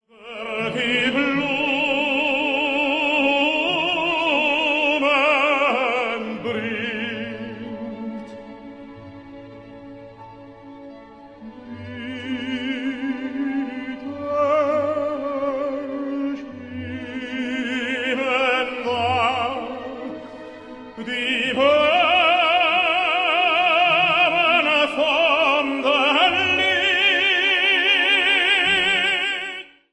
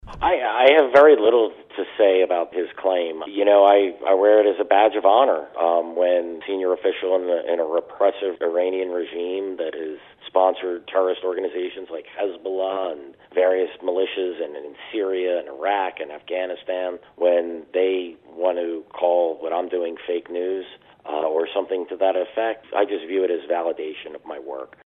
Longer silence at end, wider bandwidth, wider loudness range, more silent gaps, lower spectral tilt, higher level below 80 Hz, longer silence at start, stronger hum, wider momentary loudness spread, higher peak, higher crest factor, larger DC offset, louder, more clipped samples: about the same, 0.25 s vs 0.2 s; first, 10.5 kHz vs 4.4 kHz; first, 15 LU vs 7 LU; neither; second, -3.5 dB/octave vs -6 dB/octave; about the same, -58 dBFS vs -58 dBFS; first, 0.2 s vs 0.05 s; neither; first, 17 LU vs 14 LU; about the same, -4 dBFS vs -2 dBFS; about the same, 16 dB vs 20 dB; neither; about the same, -19 LUFS vs -21 LUFS; neither